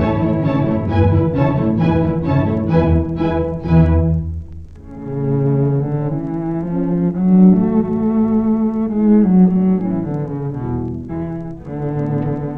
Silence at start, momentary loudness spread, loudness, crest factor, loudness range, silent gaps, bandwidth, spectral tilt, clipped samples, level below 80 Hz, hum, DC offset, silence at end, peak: 0 s; 12 LU; -16 LUFS; 16 dB; 4 LU; none; 5.2 kHz; -11.5 dB/octave; under 0.1%; -32 dBFS; none; under 0.1%; 0 s; 0 dBFS